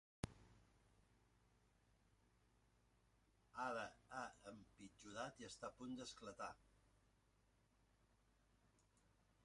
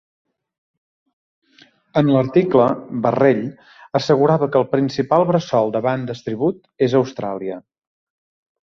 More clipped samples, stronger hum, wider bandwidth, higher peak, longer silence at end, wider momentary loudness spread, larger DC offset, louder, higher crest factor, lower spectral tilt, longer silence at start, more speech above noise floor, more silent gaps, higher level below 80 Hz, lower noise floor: neither; first, 60 Hz at -85 dBFS vs none; first, 11 kHz vs 7.2 kHz; second, -28 dBFS vs -2 dBFS; second, 0.35 s vs 1.05 s; first, 14 LU vs 10 LU; neither; second, -54 LUFS vs -18 LUFS; first, 30 dB vs 18 dB; second, -4 dB/octave vs -7.5 dB/octave; second, 0.25 s vs 1.95 s; second, 27 dB vs 36 dB; neither; second, -76 dBFS vs -60 dBFS; first, -79 dBFS vs -53 dBFS